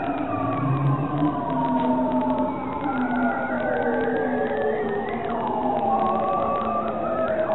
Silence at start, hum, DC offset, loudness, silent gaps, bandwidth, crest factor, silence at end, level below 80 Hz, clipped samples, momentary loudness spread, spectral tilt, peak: 0 s; none; 0.7%; -24 LUFS; none; 4.1 kHz; 12 dB; 0 s; -50 dBFS; under 0.1%; 4 LU; -10 dB/octave; -10 dBFS